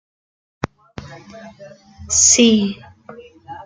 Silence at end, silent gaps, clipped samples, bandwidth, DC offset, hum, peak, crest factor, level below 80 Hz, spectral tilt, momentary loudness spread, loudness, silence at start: 0.05 s; none; under 0.1%; 10 kHz; under 0.1%; none; 0 dBFS; 20 dB; -50 dBFS; -2.5 dB/octave; 27 LU; -13 LUFS; 1 s